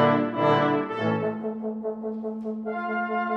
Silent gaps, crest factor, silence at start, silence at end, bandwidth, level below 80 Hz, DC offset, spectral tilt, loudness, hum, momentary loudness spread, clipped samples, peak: none; 18 dB; 0 s; 0 s; 7 kHz; -70 dBFS; under 0.1%; -8 dB/octave; -26 LUFS; none; 10 LU; under 0.1%; -8 dBFS